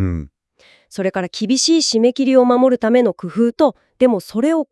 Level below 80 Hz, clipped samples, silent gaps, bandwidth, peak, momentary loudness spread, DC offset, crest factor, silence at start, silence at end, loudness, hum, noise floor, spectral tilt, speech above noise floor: -48 dBFS; under 0.1%; none; 12 kHz; -2 dBFS; 9 LU; under 0.1%; 16 dB; 0 s; 0.05 s; -16 LUFS; none; -53 dBFS; -4.5 dB/octave; 37 dB